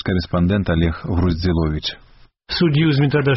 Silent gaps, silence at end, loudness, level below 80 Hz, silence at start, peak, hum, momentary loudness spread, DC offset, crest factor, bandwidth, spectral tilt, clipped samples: none; 0 s; -19 LUFS; -32 dBFS; 0.05 s; -6 dBFS; none; 9 LU; under 0.1%; 12 dB; 6 kHz; -6 dB/octave; under 0.1%